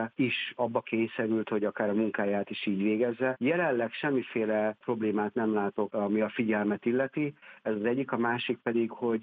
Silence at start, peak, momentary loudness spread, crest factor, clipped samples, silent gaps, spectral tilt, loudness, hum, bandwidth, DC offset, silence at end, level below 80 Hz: 0 s; -12 dBFS; 4 LU; 18 dB; under 0.1%; none; -9.5 dB/octave; -30 LUFS; none; 4.7 kHz; under 0.1%; 0 s; -76 dBFS